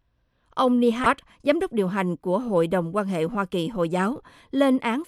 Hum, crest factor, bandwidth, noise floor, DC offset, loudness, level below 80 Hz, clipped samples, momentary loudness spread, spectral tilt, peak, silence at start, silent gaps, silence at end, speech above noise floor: none; 18 dB; 13.5 kHz; -68 dBFS; under 0.1%; -24 LUFS; -56 dBFS; under 0.1%; 6 LU; -6.5 dB/octave; -6 dBFS; 0.55 s; none; 0.05 s; 45 dB